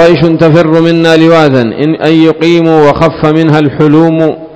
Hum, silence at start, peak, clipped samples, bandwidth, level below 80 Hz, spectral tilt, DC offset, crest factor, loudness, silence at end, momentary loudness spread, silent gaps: none; 0 s; 0 dBFS; 10%; 8 kHz; -38 dBFS; -7.5 dB/octave; under 0.1%; 6 dB; -6 LUFS; 0 s; 3 LU; none